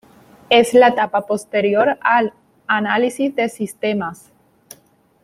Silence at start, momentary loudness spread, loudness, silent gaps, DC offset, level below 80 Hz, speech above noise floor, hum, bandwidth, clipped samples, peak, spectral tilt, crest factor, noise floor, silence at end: 0.5 s; 11 LU; -17 LUFS; none; under 0.1%; -64 dBFS; 38 dB; none; 15.5 kHz; under 0.1%; -2 dBFS; -4 dB/octave; 16 dB; -55 dBFS; 1.1 s